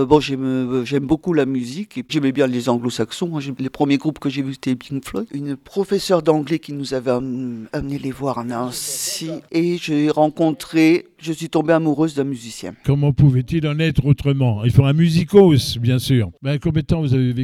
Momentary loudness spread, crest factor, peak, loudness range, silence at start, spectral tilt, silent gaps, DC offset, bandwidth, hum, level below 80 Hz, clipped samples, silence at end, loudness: 11 LU; 18 dB; 0 dBFS; 6 LU; 0 s; -6.5 dB/octave; none; under 0.1%; 15 kHz; none; -42 dBFS; under 0.1%; 0 s; -19 LUFS